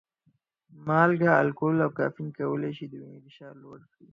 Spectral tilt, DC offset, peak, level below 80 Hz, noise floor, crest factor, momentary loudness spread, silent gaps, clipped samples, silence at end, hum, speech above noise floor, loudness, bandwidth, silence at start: -9.5 dB/octave; under 0.1%; -6 dBFS; -72 dBFS; -70 dBFS; 22 dB; 19 LU; none; under 0.1%; 0.35 s; none; 44 dB; -25 LUFS; 7.2 kHz; 0.8 s